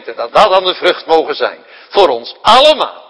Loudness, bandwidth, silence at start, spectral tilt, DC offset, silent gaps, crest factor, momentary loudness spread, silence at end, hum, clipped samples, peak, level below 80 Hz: -11 LUFS; 11 kHz; 0.05 s; -3 dB/octave; under 0.1%; none; 12 dB; 10 LU; 0.1 s; none; 2%; 0 dBFS; -46 dBFS